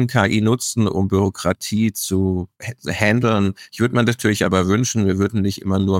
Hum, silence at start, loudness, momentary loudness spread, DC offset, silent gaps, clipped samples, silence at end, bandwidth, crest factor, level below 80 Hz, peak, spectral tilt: none; 0 s; -19 LUFS; 6 LU; under 0.1%; none; under 0.1%; 0 s; 17 kHz; 16 dB; -48 dBFS; -2 dBFS; -5.5 dB/octave